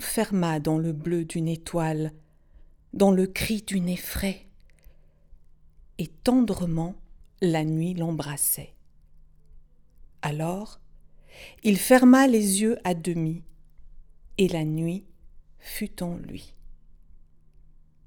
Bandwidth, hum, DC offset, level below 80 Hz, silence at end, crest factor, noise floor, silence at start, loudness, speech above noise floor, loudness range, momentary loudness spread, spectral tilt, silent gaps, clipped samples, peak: over 20 kHz; none; under 0.1%; -48 dBFS; 0.9 s; 22 dB; -52 dBFS; 0 s; -25 LUFS; 28 dB; 9 LU; 18 LU; -5.5 dB/octave; none; under 0.1%; -4 dBFS